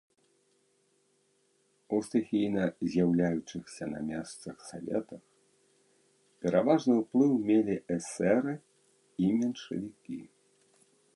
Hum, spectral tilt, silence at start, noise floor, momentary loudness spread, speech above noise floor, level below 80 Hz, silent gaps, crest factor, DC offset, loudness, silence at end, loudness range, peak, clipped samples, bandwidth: none; -7 dB/octave; 1.9 s; -72 dBFS; 17 LU; 42 dB; -66 dBFS; none; 20 dB; under 0.1%; -30 LUFS; 0.9 s; 6 LU; -12 dBFS; under 0.1%; 11.5 kHz